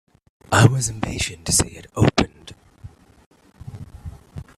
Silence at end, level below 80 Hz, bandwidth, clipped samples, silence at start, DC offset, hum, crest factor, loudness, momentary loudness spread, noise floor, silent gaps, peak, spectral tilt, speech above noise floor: 0.15 s; -42 dBFS; 14 kHz; under 0.1%; 0.5 s; under 0.1%; none; 22 dB; -20 LUFS; 23 LU; -45 dBFS; 3.26-3.31 s; 0 dBFS; -4.5 dB/octave; 27 dB